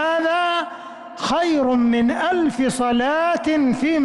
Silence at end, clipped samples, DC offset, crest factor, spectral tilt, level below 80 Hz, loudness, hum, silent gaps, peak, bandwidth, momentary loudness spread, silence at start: 0 s; under 0.1%; under 0.1%; 8 dB; -4.5 dB/octave; -52 dBFS; -19 LUFS; none; none; -12 dBFS; 11.5 kHz; 8 LU; 0 s